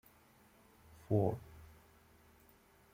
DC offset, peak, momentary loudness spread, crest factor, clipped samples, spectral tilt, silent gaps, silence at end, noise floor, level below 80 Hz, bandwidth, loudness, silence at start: under 0.1%; -20 dBFS; 27 LU; 24 dB; under 0.1%; -9.5 dB/octave; none; 1.3 s; -66 dBFS; -66 dBFS; 16 kHz; -37 LUFS; 1.1 s